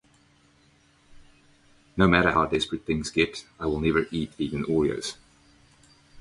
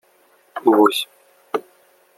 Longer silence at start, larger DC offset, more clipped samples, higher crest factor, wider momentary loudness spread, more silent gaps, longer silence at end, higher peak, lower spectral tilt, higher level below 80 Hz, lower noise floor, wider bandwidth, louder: first, 1.2 s vs 0.55 s; neither; neither; about the same, 24 dB vs 20 dB; second, 12 LU vs 17 LU; neither; second, 0 s vs 0.55 s; about the same, -4 dBFS vs -2 dBFS; first, -5.5 dB/octave vs -4 dB/octave; first, -46 dBFS vs -72 dBFS; first, -61 dBFS vs -57 dBFS; second, 11.5 kHz vs 15.5 kHz; second, -25 LUFS vs -19 LUFS